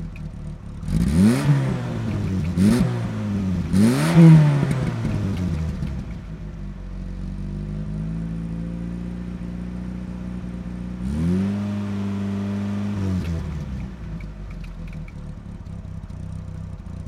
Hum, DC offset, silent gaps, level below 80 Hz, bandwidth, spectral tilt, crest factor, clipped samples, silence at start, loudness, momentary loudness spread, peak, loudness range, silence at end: none; under 0.1%; none; -36 dBFS; 13 kHz; -7.5 dB/octave; 20 dB; under 0.1%; 0 s; -22 LUFS; 18 LU; -2 dBFS; 13 LU; 0 s